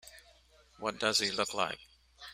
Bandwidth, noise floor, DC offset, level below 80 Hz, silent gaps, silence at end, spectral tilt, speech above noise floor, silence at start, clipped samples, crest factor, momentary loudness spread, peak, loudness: 15.5 kHz; -63 dBFS; under 0.1%; -68 dBFS; none; 0 s; -1.5 dB/octave; 30 dB; 0.05 s; under 0.1%; 24 dB; 20 LU; -12 dBFS; -32 LUFS